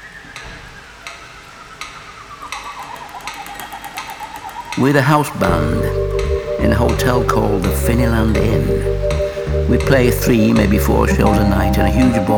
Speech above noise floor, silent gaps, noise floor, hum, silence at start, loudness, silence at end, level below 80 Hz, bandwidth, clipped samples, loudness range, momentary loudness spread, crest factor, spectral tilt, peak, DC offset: 23 dB; none; -37 dBFS; none; 0 s; -15 LUFS; 0 s; -24 dBFS; over 20 kHz; under 0.1%; 15 LU; 20 LU; 16 dB; -6.5 dB/octave; 0 dBFS; under 0.1%